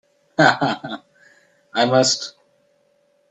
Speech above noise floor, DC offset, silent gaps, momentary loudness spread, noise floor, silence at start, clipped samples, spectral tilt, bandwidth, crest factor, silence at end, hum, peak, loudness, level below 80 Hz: 44 dB; under 0.1%; none; 18 LU; -62 dBFS; 0.4 s; under 0.1%; -3.5 dB/octave; 9.6 kHz; 22 dB; 1 s; none; 0 dBFS; -18 LUFS; -66 dBFS